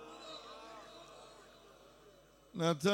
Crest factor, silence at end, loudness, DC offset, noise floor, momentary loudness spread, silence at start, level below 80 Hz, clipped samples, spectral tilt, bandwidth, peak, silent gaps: 22 dB; 0 s; -41 LUFS; under 0.1%; -63 dBFS; 25 LU; 0 s; -74 dBFS; under 0.1%; -5 dB/octave; 17 kHz; -18 dBFS; none